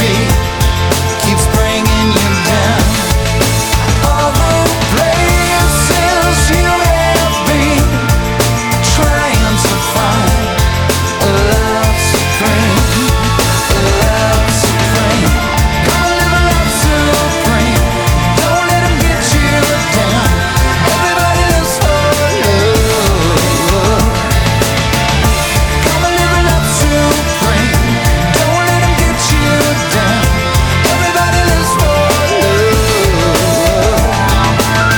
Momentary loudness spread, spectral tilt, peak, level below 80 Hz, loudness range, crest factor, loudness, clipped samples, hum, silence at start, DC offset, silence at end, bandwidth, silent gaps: 2 LU; -4 dB/octave; 0 dBFS; -18 dBFS; 1 LU; 10 dB; -11 LUFS; under 0.1%; none; 0 s; under 0.1%; 0 s; over 20 kHz; none